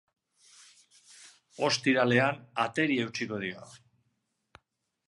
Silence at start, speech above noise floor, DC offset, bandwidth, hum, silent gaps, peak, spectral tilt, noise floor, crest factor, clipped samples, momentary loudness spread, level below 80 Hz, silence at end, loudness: 1.2 s; 50 dB; under 0.1%; 11.5 kHz; none; none; -10 dBFS; -4.5 dB/octave; -79 dBFS; 22 dB; under 0.1%; 13 LU; -74 dBFS; 1.3 s; -28 LUFS